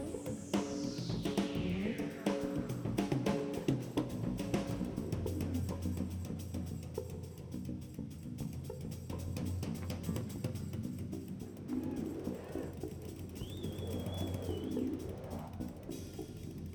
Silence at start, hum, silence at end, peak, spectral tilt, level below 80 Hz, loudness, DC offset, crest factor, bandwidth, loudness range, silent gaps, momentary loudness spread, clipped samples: 0 s; none; 0 s; -18 dBFS; -6.5 dB/octave; -54 dBFS; -40 LUFS; under 0.1%; 20 dB; over 20 kHz; 6 LU; none; 9 LU; under 0.1%